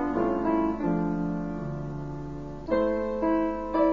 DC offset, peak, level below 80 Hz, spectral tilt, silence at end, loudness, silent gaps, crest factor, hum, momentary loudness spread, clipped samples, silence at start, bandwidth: 0.5%; -14 dBFS; -46 dBFS; -9.5 dB/octave; 0 s; -28 LUFS; none; 14 dB; none; 10 LU; under 0.1%; 0 s; 7.4 kHz